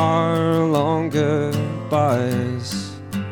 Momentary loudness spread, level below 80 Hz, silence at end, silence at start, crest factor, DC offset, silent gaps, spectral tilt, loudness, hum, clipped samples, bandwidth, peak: 9 LU; -56 dBFS; 0 s; 0 s; 14 dB; under 0.1%; none; -6.5 dB/octave; -21 LUFS; none; under 0.1%; 19 kHz; -6 dBFS